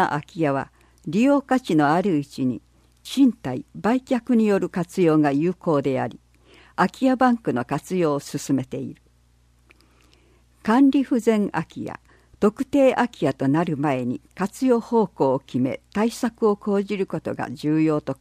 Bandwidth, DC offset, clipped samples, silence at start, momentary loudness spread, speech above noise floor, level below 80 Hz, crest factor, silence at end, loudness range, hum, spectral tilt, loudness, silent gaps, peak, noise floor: 15 kHz; under 0.1%; under 0.1%; 0 s; 11 LU; 37 dB; -58 dBFS; 16 dB; 0.05 s; 3 LU; 60 Hz at -50 dBFS; -7 dB/octave; -22 LUFS; none; -6 dBFS; -58 dBFS